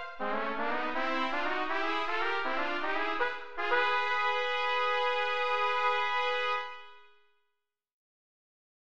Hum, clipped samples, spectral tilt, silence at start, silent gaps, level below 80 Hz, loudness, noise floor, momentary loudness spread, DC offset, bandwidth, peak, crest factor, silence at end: none; under 0.1%; -3 dB/octave; 0 s; none; -66 dBFS; -30 LUFS; -84 dBFS; 5 LU; 1%; 8.8 kHz; -16 dBFS; 18 dB; 0.9 s